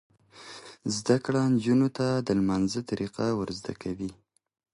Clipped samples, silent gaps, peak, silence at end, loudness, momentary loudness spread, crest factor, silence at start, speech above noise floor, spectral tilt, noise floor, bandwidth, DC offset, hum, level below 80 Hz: under 0.1%; none; -10 dBFS; 0.6 s; -28 LUFS; 13 LU; 20 dB; 0.35 s; 20 dB; -6 dB/octave; -47 dBFS; 11.5 kHz; under 0.1%; none; -58 dBFS